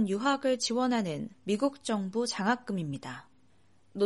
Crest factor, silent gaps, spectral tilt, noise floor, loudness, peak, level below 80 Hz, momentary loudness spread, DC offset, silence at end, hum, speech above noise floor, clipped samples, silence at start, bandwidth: 16 dB; none; -4.5 dB/octave; -67 dBFS; -31 LUFS; -16 dBFS; -72 dBFS; 12 LU; under 0.1%; 0 s; none; 36 dB; under 0.1%; 0 s; 11.5 kHz